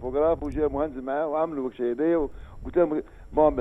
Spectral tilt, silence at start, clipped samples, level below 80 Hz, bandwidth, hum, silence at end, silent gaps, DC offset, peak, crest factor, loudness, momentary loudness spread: -9.5 dB/octave; 0 s; under 0.1%; -42 dBFS; 5.8 kHz; none; 0 s; none; under 0.1%; -8 dBFS; 18 dB; -26 LUFS; 7 LU